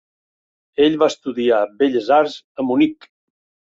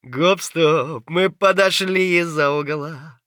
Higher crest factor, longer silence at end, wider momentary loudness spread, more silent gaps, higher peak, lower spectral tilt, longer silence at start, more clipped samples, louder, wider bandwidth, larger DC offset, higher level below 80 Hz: about the same, 16 dB vs 16 dB; first, 0.75 s vs 0.15 s; about the same, 7 LU vs 8 LU; first, 2.44-2.55 s vs none; about the same, -2 dBFS vs -2 dBFS; about the same, -5 dB/octave vs -4.5 dB/octave; first, 0.8 s vs 0.05 s; neither; about the same, -18 LUFS vs -18 LUFS; second, 7.8 kHz vs over 20 kHz; neither; first, -62 dBFS vs -72 dBFS